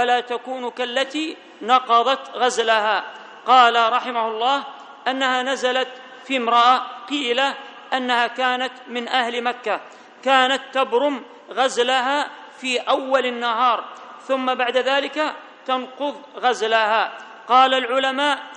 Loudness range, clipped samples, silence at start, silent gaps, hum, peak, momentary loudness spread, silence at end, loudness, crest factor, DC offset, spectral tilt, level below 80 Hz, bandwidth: 3 LU; under 0.1%; 0 s; none; none; -2 dBFS; 13 LU; 0 s; -20 LUFS; 20 dB; under 0.1%; -1.5 dB/octave; -76 dBFS; 9.4 kHz